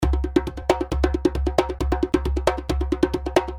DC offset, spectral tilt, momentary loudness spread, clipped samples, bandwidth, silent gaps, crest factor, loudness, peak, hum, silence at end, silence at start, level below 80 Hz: under 0.1%; -6.5 dB/octave; 3 LU; under 0.1%; 13.5 kHz; none; 20 dB; -23 LUFS; -2 dBFS; none; 0 s; 0 s; -28 dBFS